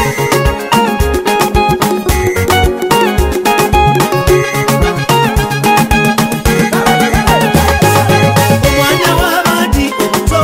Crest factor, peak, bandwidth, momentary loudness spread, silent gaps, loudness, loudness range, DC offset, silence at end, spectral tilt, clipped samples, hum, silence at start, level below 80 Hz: 10 dB; 0 dBFS; 16.5 kHz; 3 LU; none; -10 LUFS; 2 LU; under 0.1%; 0 s; -4.5 dB/octave; under 0.1%; none; 0 s; -20 dBFS